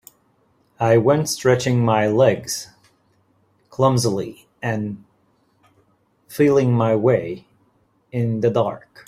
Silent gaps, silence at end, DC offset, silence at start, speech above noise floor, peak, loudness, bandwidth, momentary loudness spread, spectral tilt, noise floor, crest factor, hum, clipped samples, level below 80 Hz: none; 0.3 s; under 0.1%; 0.8 s; 44 dB; -2 dBFS; -19 LUFS; 15.5 kHz; 16 LU; -6 dB/octave; -62 dBFS; 18 dB; none; under 0.1%; -58 dBFS